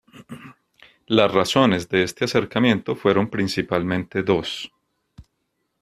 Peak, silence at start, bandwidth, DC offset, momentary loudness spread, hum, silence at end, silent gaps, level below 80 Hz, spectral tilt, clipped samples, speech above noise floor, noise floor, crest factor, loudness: -2 dBFS; 0.15 s; 14 kHz; under 0.1%; 19 LU; none; 0.6 s; none; -54 dBFS; -5.5 dB/octave; under 0.1%; 54 dB; -74 dBFS; 20 dB; -21 LUFS